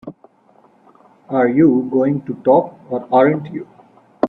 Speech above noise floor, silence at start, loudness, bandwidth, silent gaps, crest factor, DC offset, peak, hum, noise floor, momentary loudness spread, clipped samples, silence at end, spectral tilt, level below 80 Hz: 37 dB; 0.05 s; -16 LUFS; 5 kHz; none; 18 dB; under 0.1%; 0 dBFS; none; -52 dBFS; 15 LU; under 0.1%; 0 s; -10.5 dB/octave; -60 dBFS